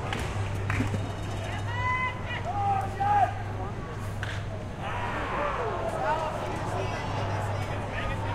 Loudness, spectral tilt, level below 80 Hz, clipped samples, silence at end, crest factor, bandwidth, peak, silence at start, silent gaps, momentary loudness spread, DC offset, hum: -30 LUFS; -6 dB/octave; -42 dBFS; under 0.1%; 0 s; 16 dB; 13 kHz; -12 dBFS; 0 s; none; 7 LU; under 0.1%; none